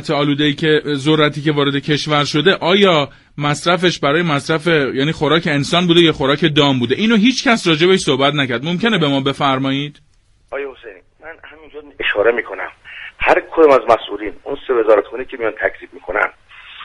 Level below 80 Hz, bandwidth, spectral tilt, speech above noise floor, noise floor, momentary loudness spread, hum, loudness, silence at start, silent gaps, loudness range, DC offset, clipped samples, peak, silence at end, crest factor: -46 dBFS; 11.5 kHz; -5 dB/octave; 23 dB; -38 dBFS; 14 LU; none; -15 LUFS; 0 s; none; 7 LU; under 0.1%; under 0.1%; 0 dBFS; 0 s; 16 dB